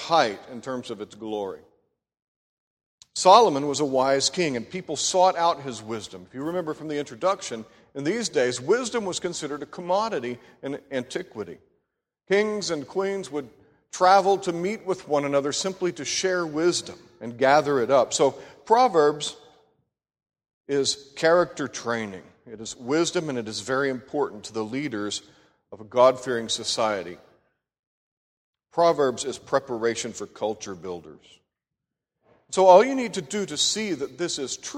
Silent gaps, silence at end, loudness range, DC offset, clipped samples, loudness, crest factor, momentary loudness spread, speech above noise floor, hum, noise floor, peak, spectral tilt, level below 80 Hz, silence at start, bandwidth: 2.22-2.77 s, 2.86-2.98 s, 20.54-20.64 s, 27.79-28.53 s; 0 s; 6 LU; under 0.1%; under 0.1%; -24 LUFS; 24 dB; 16 LU; 62 dB; none; -86 dBFS; -2 dBFS; -3.5 dB/octave; -68 dBFS; 0 s; 13.5 kHz